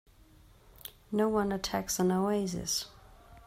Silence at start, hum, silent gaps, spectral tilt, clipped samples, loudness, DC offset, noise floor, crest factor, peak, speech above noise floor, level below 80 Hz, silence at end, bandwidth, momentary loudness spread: 0.85 s; none; none; -4.5 dB/octave; under 0.1%; -31 LUFS; under 0.1%; -59 dBFS; 16 dB; -16 dBFS; 28 dB; -56 dBFS; 0.05 s; 16 kHz; 19 LU